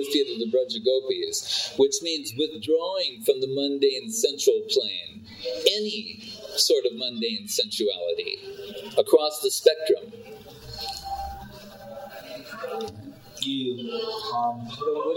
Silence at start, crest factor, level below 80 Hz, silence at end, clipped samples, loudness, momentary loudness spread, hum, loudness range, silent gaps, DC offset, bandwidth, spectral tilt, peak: 0 s; 22 dB; -56 dBFS; 0 s; under 0.1%; -25 LUFS; 18 LU; none; 9 LU; none; under 0.1%; 17.5 kHz; -2.5 dB/octave; -4 dBFS